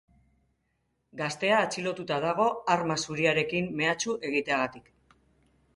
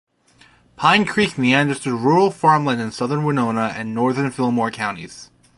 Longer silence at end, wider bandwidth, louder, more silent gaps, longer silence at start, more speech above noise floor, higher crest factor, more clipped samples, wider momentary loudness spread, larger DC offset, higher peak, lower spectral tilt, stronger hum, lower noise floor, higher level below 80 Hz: first, 0.95 s vs 0.35 s; about the same, 11.5 kHz vs 11.5 kHz; second, -28 LUFS vs -18 LUFS; neither; first, 1.15 s vs 0.8 s; first, 48 dB vs 35 dB; about the same, 22 dB vs 18 dB; neither; about the same, 8 LU vs 8 LU; neither; second, -8 dBFS vs -2 dBFS; second, -4 dB/octave vs -5.5 dB/octave; neither; first, -76 dBFS vs -53 dBFS; second, -66 dBFS vs -58 dBFS